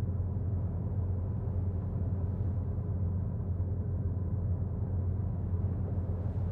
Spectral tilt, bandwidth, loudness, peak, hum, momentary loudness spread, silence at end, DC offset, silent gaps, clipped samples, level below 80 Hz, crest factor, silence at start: -13 dB/octave; 2 kHz; -34 LUFS; -22 dBFS; none; 1 LU; 0 s; under 0.1%; none; under 0.1%; -42 dBFS; 10 dB; 0 s